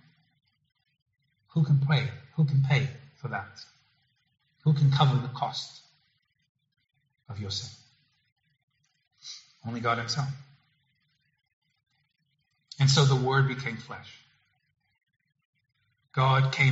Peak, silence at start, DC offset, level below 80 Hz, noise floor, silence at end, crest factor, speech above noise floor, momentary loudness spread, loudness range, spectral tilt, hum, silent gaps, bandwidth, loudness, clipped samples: -8 dBFS; 1.55 s; under 0.1%; -64 dBFS; -76 dBFS; 0 s; 22 dB; 50 dB; 21 LU; 11 LU; -5 dB/octave; none; 6.49-6.55 s, 8.32-8.36 s, 8.63-8.68 s, 11.53-11.62 s, 15.45-15.53 s; 8 kHz; -27 LUFS; under 0.1%